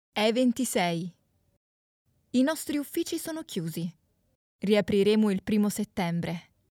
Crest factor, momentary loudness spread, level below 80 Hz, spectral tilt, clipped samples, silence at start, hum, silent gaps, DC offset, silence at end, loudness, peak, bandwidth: 16 dB; 12 LU; -64 dBFS; -5 dB/octave; under 0.1%; 0.15 s; none; 1.57-2.05 s, 4.35-4.59 s; under 0.1%; 0.3 s; -28 LUFS; -12 dBFS; 18 kHz